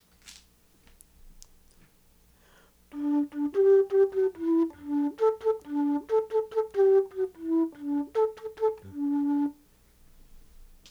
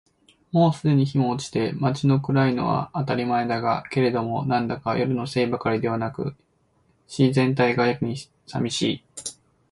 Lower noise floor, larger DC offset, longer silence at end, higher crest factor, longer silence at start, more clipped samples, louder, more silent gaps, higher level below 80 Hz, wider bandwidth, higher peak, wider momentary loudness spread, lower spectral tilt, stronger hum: about the same, -61 dBFS vs -64 dBFS; neither; second, 0.25 s vs 0.4 s; about the same, 14 dB vs 16 dB; second, 0.25 s vs 0.55 s; neither; second, -27 LUFS vs -23 LUFS; neither; about the same, -60 dBFS vs -58 dBFS; about the same, 11.5 kHz vs 11.5 kHz; second, -14 dBFS vs -6 dBFS; about the same, 9 LU vs 10 LU; about the same, -6.5 dB/octave vs -6.5 dB/octave; neither